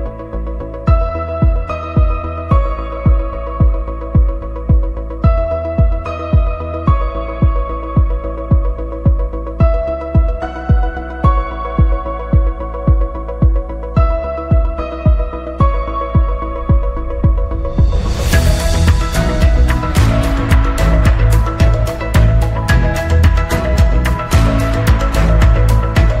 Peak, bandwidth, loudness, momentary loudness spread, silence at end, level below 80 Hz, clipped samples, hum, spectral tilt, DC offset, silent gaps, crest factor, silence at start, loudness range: 0 dBFS; 15 kHz; -15 LUFS; 7 LU; 0 s; -16 dBFS; under 0.1%; none; -7 dB/octave; under 0.1%; none; 12 dB; 0 s; 4 LU